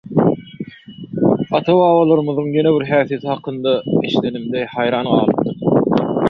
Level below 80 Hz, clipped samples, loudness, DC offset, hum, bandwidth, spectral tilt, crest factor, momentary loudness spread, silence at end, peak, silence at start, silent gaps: -52 dBFS; under 0.1%; -16 LUFS; under 0.1%; none; 6.2 kHz; -9 dB/octave; 14 dB; 10 LU; 0 s; -2 dBFS; 0.05 s; none